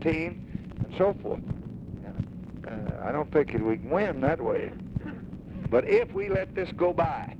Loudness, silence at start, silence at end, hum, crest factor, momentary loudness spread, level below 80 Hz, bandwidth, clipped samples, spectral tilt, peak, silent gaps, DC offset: -29 LUFS; 0 s; 0 s; none; 18 dB; 14 LU; -46 dBFS; 8 kHz; under 0.1%; -9 dB/octave; -10 dBFS; none; under 0.1%